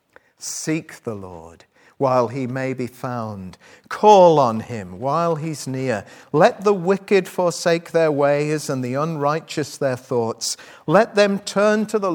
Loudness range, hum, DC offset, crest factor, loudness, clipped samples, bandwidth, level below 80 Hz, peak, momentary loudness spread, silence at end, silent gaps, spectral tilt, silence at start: 7 LU; none; under 0.1%; 20 dB; -19 LUFS; under 0.1%; 19.5 kHz; -66 dBFS; 0 dBFS; 13 LU; 0 s; none; -5 dB/octave; 0.4 s